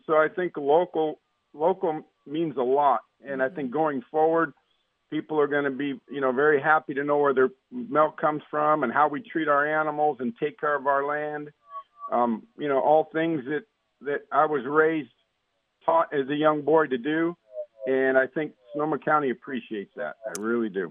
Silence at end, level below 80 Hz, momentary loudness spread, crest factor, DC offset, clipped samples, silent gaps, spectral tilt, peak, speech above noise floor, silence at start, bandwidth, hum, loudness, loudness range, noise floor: 0 s; -82 dBFS; 12 LU; 18 dB; under 0.1%; under 0.1%; none; -6.5 dB/octave; -6 dBFS; 51 dB; 0.1 s; 9 kHz; none; -25 LUFS; 3 LU; -75 dBFS